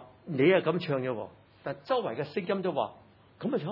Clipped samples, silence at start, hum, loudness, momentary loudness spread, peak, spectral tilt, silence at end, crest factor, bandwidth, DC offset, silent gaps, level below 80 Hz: under 0.1%; 0 s; none; -30 LUFS; 15 LU; -12 dBFS; -9 dB/octave; 0 s; 20 dB; 5.8 kHz; under 0.1%; none; -76 dBFS